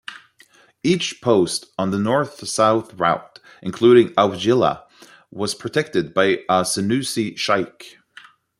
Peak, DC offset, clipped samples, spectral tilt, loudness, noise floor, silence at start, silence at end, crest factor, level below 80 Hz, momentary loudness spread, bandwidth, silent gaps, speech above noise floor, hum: -2 dBFS; under 0.1%; under 0.1%; -4.5 dB/octave; -19 LUFS; -53 dBFS; 0.1 s; 0.7 s; 18 dB; -60 dBFS; 11 LU; 13.5 kHz; none; 34 dB; none